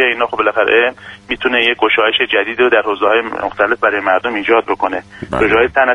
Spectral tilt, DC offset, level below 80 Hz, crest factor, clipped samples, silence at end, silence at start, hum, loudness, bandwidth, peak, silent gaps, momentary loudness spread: -5 dB/octave; under 0.1%; -44 dBFS; 14 dB; under 0.1%; 0 s; 0 s; none; -13 LUFS; 9.8 kHz; 0 dBFS; none; 8 LU